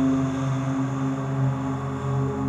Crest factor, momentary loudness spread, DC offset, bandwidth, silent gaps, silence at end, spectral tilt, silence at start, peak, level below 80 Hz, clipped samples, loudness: 12 dB; 3 LU; under 0.1%; 8.2 kHz; none; 0 s; -8 dB/octave; 0 s; -14 dBFS; -54 dBFS; under 0.1%; -26 LUFS